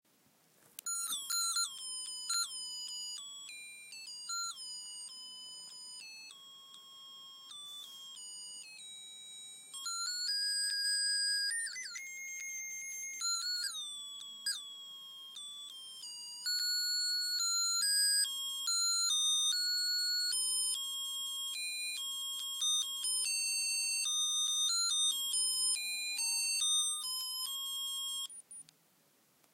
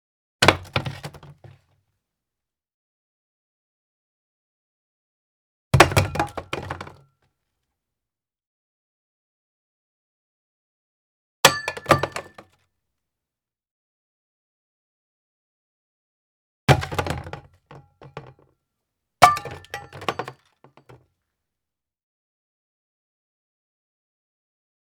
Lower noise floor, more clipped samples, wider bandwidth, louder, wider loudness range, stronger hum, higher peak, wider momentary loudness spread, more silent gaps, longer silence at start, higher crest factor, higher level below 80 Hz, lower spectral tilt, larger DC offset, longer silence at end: second, -71 dBFS vs -89 dBFS; neither; second, 16 kHz vs over 20 kHz; second, -33 LUFS vs -21 LUFS; about the same, 14 LU vs 13 LU; neither; second, -22 dBFS vs 0 dBFS; second, 18 LU vs 23 LU; second, none vs 2.74-5.71 s, 8.47-11.43 s, 13.71-16.67 s; first, 0.85 s vs 0.4 s; second, 16 dB vs 28 dB; second, under -90 dBFS vs -48 dBFS; second, 5.5 dB/octave vs -4 dB/octave; neither; second, 0.9 s vs 4.6 s